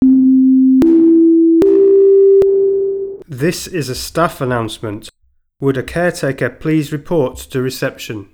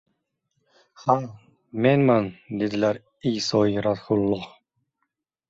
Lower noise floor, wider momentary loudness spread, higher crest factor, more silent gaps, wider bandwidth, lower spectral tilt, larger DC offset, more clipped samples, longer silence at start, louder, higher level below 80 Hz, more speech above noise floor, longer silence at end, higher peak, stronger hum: second, -58 dBFS vs -78 dBFS; about the same, 13 LU vs 11 LU; second, 12 dB vs 20 dB; neither; first, 17.5 kHz vs 8 kHz; about the same, -6.5 dB/octave vs -6.5 dB/octave; neither; neither; second, 0 s vs 1 s; first, -13 LUFS vs -23 LUFS; first, -42 dBFS vs -58 dBFS; second, 40 dB vs 56 dB; second, 0.1 s vs 1 s; first, 0 dBFS vs -4 dBFS; neither